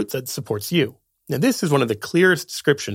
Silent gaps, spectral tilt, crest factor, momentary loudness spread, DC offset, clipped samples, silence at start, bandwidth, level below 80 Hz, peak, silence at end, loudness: none; -5 dB/octave; 18 dB; 10 LU; under 0.1%; under 0.1%; 0 s; 17 kHz; -64 dBFS; -2 dBFS; 0 s; -21 LUFS